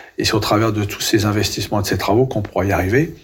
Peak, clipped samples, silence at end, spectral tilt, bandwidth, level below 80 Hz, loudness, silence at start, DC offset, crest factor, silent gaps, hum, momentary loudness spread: -4 dBFS; under 0.1%; 0.1 s; -5 dB/octave; 17 kHz; -42 dBFS; -18 LUFS; 0 s; under 0.1%; 12 dB; none; none; 4 LU